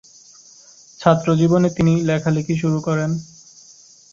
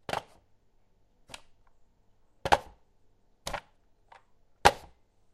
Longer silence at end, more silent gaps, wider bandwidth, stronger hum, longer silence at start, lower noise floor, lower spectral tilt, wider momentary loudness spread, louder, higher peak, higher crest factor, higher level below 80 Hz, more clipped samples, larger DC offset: first, 0.9 s vs 0.55 s; neither; second, 7.6 kHz vs 15.5 kHz; neither; first, 1 s vs 0.1 s; second, -47 dBFS vs -66 dBFS; first, -7 dB/octave vs -3 dB/octave; second, 6 LU vs 24 LU; first, -18 LUFS vs -29 LUFS; about the same, -2 dBFS vs -2 dBFS; second, 18 dB vs 32 dB; about the same, -52 dBFS vs -54 dBFS; neither; neither